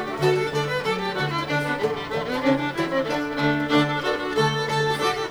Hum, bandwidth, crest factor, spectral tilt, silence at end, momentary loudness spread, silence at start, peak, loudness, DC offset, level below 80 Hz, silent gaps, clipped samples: none; over 20 kHz; 16 dB; -5.5 dB/octave; 0 s; 4 LU; 0 s; -8 dBFS; -23 LUFS; under 0.1%; -52 dBFS; none; under 0.1%